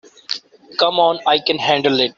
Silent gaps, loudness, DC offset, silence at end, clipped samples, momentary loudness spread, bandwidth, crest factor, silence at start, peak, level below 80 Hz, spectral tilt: none; -17 LUFS; under 0.1%; 0.05 s; under 0.1%; 12 LU; 7.6 kHz; 16 dB; 0.3 s; -2 dBFS; -62 dBFS; -4 dB/octave